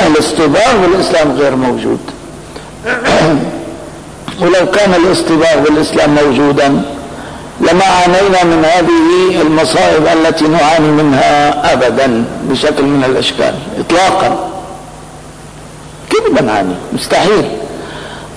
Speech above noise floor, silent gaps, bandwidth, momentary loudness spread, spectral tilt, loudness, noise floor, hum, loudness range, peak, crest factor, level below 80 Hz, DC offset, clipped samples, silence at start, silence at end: 21 dB; none; 11 kHz; 19 LU; -5 dB/octave; -10 LUFS; -30 dBFS; none; 6 LU; -2 dBFS; 8 dB; -36 dBFS; under 0.1%; under 0.1%; 0 s; 0 s